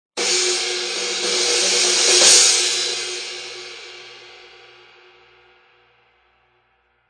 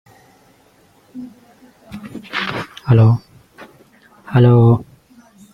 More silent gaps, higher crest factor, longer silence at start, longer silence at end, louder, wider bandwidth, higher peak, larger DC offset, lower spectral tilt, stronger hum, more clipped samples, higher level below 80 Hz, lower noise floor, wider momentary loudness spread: neither; about the same, 20 dB vs 16 dB; second, 0.15 s vs 1.15 s; first, 2.75 s vs 0.7 s; about the same, -15 LUFS vs -15 LUFS; first, 10.5 kHz vs 5.8 kHz; about the same, 0 dBFS vs -2 dBFS; neither; second, 1.5 dB/octave vs -8.5 dB/octave; neither; neither; second, -74 dBFS vs -46 dBFS; first, -63 dBFS vs -52 dBFS; about the same, 24 LU vs 25 LU